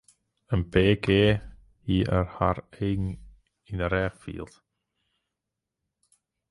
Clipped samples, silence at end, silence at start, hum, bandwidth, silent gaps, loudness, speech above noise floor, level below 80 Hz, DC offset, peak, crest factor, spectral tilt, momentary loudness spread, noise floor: under 0.1%; 2.05 s; 0.5 s; none; 11.5 kHz; none; -26 LUFS; 61 dB; -42 dBFS; under 0.1%; -8 dBFS; 20 dB; -7.5 dB/octave; 18 LU; -86 dBFS